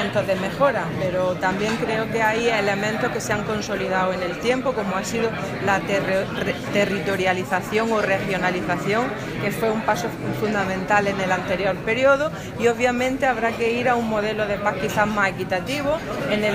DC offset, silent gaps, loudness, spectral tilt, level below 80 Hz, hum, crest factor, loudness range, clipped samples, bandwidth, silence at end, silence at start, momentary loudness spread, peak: under 0.1%; none; -22 LUFS; -5 dB/octave; -48 dBFS; none; 18 dB; 2 LU; under 0.1%; 15.5 kHz; 0 s; 0 s; 5 LU; -4 dBFS